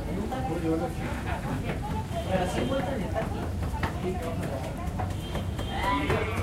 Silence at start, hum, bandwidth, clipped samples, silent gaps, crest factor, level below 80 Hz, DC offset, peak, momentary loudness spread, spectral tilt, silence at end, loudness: 0 s; none; 16 kHz; under 0.1%; none; 18 dB; -38 dBFS; under 0.1%; -12 dBFS; 5 LU; -6.5 dB/octave; 0 s; -30 LUFS